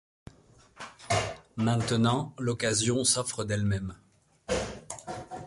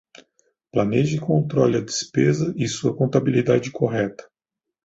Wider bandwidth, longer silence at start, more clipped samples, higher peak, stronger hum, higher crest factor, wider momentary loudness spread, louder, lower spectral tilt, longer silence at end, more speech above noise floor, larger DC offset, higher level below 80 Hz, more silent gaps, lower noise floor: first, 11.5 kHz vs 8 kHz; about the same, 0.75 s vs 0.75 s; neither; second, -12 dBFS vs -2 dBFS; neither; about the same, 18 dB vs 18 dB; first, 16 LU vs 5 LU; second, -29 LUFS vs -21 LUFS; second, -4 dB/octave vs -6 dB/octave; second, 0 s vs 0.65 s; second, 30 dB vs 65 dB; neither; about the same, -52 dBFS vs -56 dBFS; neither; second, -58 dBFS vs -85 dBFS